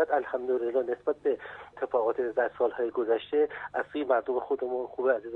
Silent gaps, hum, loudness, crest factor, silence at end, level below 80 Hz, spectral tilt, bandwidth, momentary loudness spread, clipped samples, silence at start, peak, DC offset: none; none; -30 LUFS; 16 dB; 0 s; -68 dBFS; -7 dB/octave; 4.2 kHz; 5 LU; under 0.1%; 0 s; -12 dBFS; under 0.1%